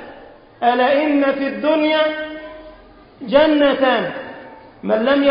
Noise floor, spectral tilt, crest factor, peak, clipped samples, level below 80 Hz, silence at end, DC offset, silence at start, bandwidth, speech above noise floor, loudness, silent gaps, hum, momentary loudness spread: -44 dBFS; -10 dB/octave; 16 dB; -2 dBFS; under 0.1%; -52 dBFS; 0 s; under 0.1%; 0 s; 5.4 kHz; 28 dB; -17 LUFS; none; none; 20 LU